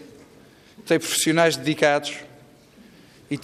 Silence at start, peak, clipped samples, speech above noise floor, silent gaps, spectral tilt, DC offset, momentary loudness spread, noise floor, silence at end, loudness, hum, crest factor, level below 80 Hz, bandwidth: 0 s; -6 dBFS; under 0.1%; 30 dB; none; -3.5 dB/octave; under 0.1%; 16 LU; -51 dBFS; 0 s; -21 LUFS; none; 18 dB; -66 dBFS; 15.5 kHz